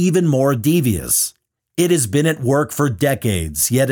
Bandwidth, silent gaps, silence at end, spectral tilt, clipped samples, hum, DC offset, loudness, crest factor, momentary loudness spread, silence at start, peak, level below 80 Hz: 19 kHz; none; 0 s; -5 dB/octave; under 0.1%; none; under 0.1%; -17 LUFS; 12 dB; 5 LU; 0 s; -4 dBFS; -42 dBFS